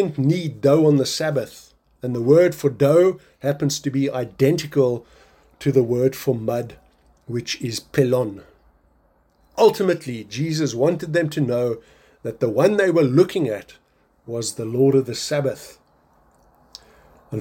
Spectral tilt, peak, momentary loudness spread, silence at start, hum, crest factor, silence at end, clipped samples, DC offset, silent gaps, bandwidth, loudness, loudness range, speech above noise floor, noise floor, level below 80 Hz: -6 dB/octave; -4 dBFS; 14 LU; 0 s; none; 18 dB; 0 s; under 0.1%; under 0.1%; none; 17 kHz; -20 LUFS; 6 LU; 41 dB; -60 dBFS; -58 dBFS